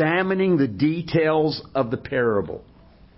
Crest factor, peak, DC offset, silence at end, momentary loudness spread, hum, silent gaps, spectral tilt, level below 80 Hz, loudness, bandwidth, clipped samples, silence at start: 14 dB; -8 dBFS; under 0.1%; 0.55 s; 6 LU; none; none; -11 dB/octave; -52 dBFS; -22 LUFS; 5.8 kHz; under 0.1%; 0 s